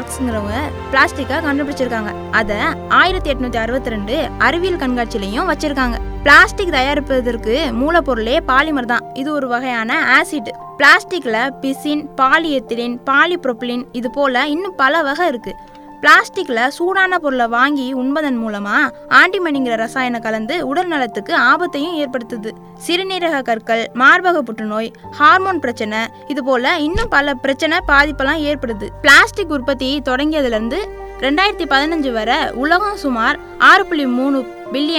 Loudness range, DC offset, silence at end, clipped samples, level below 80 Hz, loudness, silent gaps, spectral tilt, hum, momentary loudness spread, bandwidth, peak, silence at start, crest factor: 3 LU; under 0.1%; 0 s; 0.2%; -34 dBFS; -15 LUFS; none; -4 dB/octave; none; 12 LU; over 20 kHz; 0 dBFS; 0 s; 16 dB